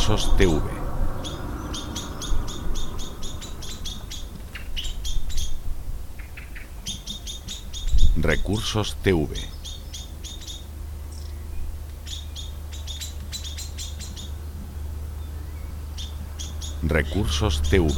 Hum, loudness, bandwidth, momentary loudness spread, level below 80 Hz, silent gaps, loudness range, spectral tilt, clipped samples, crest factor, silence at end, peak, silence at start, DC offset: none; -29 LUFS; 16.5 kHz; 14 LU; -28 dBFS; none; 8 LU; -4.5 dB/octave; under 0.1%; 22 dB; 0 s; -2 dBFS; 0 s; under 0.1%